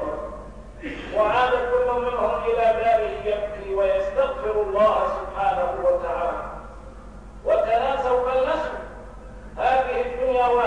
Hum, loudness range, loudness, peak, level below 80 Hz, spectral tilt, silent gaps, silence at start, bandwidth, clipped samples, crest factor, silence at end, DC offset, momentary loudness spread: none; 3 LU; -23 LUFS; -8 dBFS; -42 dBFS; -5.5 dB/octave; none; 0 s; 10 kHz; under 0.1%; 14 dB; 0 s; 0.2%; 19 LU